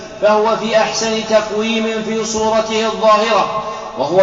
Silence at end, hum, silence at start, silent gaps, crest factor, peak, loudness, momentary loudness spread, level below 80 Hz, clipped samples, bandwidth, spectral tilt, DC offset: 0 s; none; 0 s; none; 12 dB; -4 dBFS; -15 LUFS; 7 LU; -48 dBFS; under 0.1%; 8 kHz; -2.5 dB/octave; 0.1%